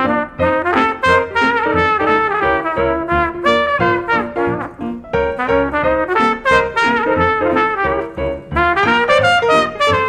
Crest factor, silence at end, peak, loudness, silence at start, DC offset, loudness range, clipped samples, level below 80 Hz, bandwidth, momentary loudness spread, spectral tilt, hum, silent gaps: 14 dB; 0 s; 0 dBFS; -15 LUFS; 0 s; under 0.1%; 2 LU; under 0.1%; -36 dBFS; 11.5 kHz; 7 LU; -5.5 dB/octave; none; none